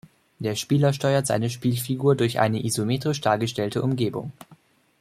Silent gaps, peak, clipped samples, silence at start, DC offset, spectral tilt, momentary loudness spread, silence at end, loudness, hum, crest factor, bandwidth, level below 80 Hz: none; -4 dBFS; under 0.1%; 0.4 s; under 0.1%; -5.5 dB/octave; 7 LU; 0.45 s; -24 LUFS; none; 20 dB; 15.5 kHz; -60 dBFS